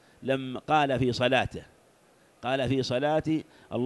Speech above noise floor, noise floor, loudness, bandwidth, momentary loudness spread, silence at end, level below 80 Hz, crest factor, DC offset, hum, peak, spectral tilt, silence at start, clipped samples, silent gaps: 34 dB; -61 dBFS; -28 LUFS; 12 kHz; 11 LU; 0 s; -54 dBFS; 18 dB; under 0.1%; none; -10 dBFS; -6 dB/octave; 0.2 s; under 0.1%; none